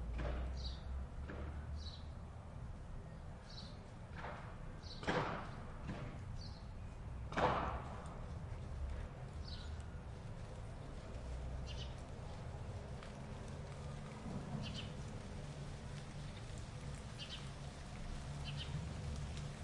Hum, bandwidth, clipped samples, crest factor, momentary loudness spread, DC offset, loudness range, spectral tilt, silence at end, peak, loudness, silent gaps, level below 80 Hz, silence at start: none; 11.5 kHz; under 0.1%; 24 dB; 8 LU; under 0.1%; 5 LU; -5.5 dB/octave; 0 s; -22 dBFS; -47 LUFS; none; -50 dBFS; 0 s